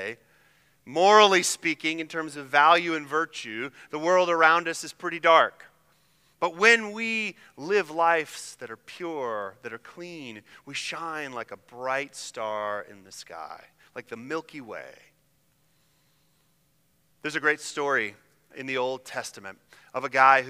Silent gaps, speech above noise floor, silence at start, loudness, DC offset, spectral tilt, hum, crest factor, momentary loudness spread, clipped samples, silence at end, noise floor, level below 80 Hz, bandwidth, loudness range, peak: none; 43 dB; 0 s; -25 LUFS; under 0.1%; -2.5 dB/octave; none; 24 dB; 22 LU; under 0.1%; 0 s; -68 dBFS; -78 dBFS; 16 kHz; 16 LU; -2 dBFS